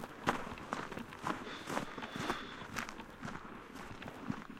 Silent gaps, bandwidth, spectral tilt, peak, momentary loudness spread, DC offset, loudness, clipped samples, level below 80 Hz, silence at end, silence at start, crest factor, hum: none; 16.5 kHz; -4.5 dB/octave; -12 dBFS; 10 LU; under 0.1%; -43 LUFS; under 0.1%; -60 dBFS; 0 s; 0 s; 30 dB; none